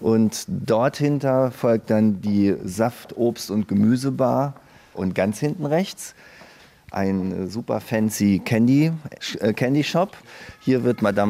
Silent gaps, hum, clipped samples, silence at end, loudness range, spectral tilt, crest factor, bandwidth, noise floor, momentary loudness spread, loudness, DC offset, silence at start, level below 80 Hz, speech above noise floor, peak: none; none; under 0.1%; 0 s; 4 LU; -6.5 dB/octave; 16 dB; 16 kHz; -48 dBFS; 9 LU; -22 LUFS; under 0.1%; 0 s; -58 dBFS; 27 dB; -6 dBFS